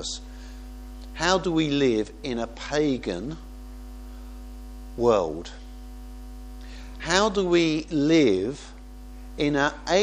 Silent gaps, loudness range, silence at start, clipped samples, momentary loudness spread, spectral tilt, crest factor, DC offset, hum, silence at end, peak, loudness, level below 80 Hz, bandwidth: none; 7 LU; 0 s; under 0.1%; 21 LU; -4.5 dB/octave; 22 dB; under 0.1%; 50 Hz at -40 dBFS; 0 s; -4 dBFS; -24 LUFS; -42 dBFS; 14.5 kHz